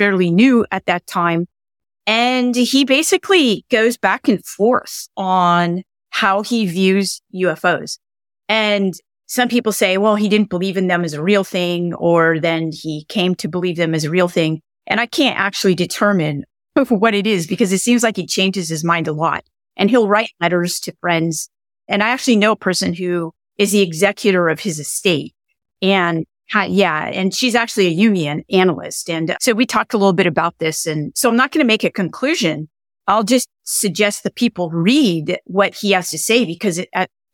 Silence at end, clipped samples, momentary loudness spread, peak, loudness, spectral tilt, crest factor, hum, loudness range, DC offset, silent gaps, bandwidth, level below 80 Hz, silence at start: 0.25 s; under 0.1%; 8 LU; -2 dBFS; -16 LUFS; -4.5 dB/octave; 14 dB; none; 2 LU; under 0.1%; none; 18 kHz; -62 dBFS; 0 s